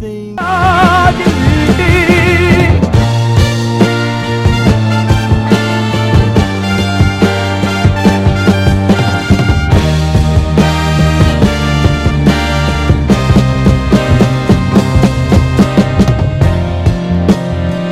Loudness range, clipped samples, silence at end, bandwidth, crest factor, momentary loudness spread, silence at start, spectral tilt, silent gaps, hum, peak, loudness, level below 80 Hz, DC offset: 2 LU; 1%; 0 s; 15 kHz; 10 dB; 5 LU; 0 s; -6.5 dB/octave; none; none; 0 dBFS; -10 LUFS; -20 dBFS; under 0.1%